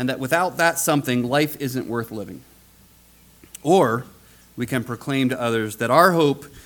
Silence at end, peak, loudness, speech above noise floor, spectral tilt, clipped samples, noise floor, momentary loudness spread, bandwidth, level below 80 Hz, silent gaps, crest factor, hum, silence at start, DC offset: 0.05 s; 0 dBFS; -21 LUFS; 31 dB; -5 dB/octave; under 0.1%; -52 dBFS; 13 LU; 19 kHz; -58 dBFS; none; 22 dB; none; 0 s; under 0.1%